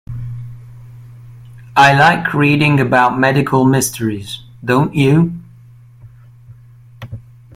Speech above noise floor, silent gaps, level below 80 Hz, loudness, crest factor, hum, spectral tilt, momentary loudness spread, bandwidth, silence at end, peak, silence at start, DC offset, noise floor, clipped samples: 29 dB; none; -46 dBFS; -13 LUFS; 16 dB; none; -5.5 dB/octave; 22 LU; 16 kHz; 0.35 s; 0 dBFS; 0.1 s; under 0.1%; -41 dBFS; under 0.1%